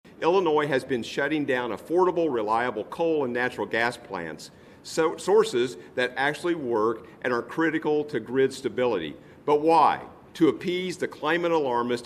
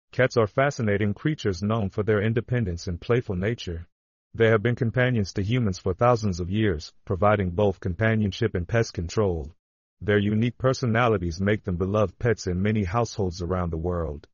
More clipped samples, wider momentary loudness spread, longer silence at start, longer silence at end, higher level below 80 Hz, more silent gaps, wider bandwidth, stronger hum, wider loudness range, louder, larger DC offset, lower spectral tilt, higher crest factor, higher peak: neither; first, 10 LU vs 7 LU; about the same, 0.05 s vs 0.15 s; second, 0 s vs 0.15 s; second, -66 dBFS vs -44 dBFS; second, none vs 3.92-4.31 s, 9.59-9.97 s; first, 14 kHz vs 7.2 kHz; neither; about the same, 2 LU vs 2 LU; about the same, -25 LUFS vs -25 LUFS; neither; about the same, -5 dB/octave vs -6 dB/octave; about the same, 18 dB vs 16 dB; about the same, -8 dBFS vs -8 dBFS